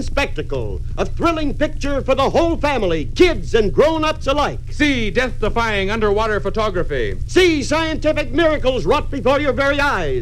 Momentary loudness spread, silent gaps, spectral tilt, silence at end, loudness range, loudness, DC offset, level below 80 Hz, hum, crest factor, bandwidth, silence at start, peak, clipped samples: 7 LU; none; -5.5 dB/octave; 0 s; 2 LU; -18 LUFS; under 0.1%; -24 dBFS; none; 16 dB; 11.5 kHz; 0 s; 0 dBFS; under 0.1%